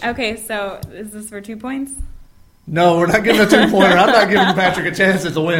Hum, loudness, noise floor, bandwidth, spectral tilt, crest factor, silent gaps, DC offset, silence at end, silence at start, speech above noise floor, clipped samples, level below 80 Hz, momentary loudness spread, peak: none; -14 LUFS; -44 dBFS; 16.5 kHz; -5 dB/octave; 16 dB; none; under 0.1%; 0 s; 0 s; 29 dB; under 0.1%; -40 dBFS; 19 LU; 0 dBFS